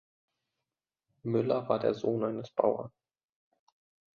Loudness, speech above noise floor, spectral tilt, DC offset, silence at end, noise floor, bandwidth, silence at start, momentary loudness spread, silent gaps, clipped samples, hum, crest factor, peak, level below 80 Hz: -31 LUFS; 60 dB; -8.5 dB/octave; under 0.1%; 1.3 s; -90 dBFS; 7 kHz; 1.25 s; 9 LU; none; under 0.1%; none; 24 dB; -10 dBFS; -74 dBFS